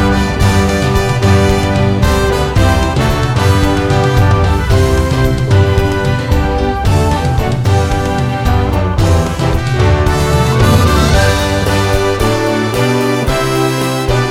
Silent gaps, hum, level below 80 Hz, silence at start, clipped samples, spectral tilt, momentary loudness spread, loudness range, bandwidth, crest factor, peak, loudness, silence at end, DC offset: none; none; -18 dBFS; 0 s; under 0.1%; -6 dB/octave; 4 LU; 2 LU; 16 kHz; 10 dB; 0 dBFS; -12 LUFS; 0 s; under 0.1%